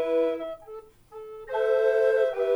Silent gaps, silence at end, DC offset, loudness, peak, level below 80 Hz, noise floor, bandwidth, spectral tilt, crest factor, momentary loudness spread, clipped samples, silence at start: none; 0 s; under 0.1%; -25 LUFS; -12 dBFS; -62 dBFS; -45 dBFS; 10.5 kHz; -4.5 dB/octave; 14 dB; 22 LU; under 0.1%; 0 s